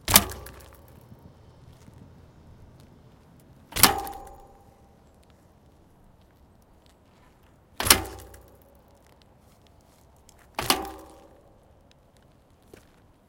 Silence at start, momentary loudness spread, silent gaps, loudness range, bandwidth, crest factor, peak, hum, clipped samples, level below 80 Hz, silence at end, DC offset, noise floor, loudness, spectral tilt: 0.1 s; 29 LU; none; 6 LU; 17 kHz; 32 dB; 0 dBFS; none; under 0.1%; -50 dBFS; 2.25 s; under 0.1%; -58 dBFS; -22 LUFS; -1.5 dB/octave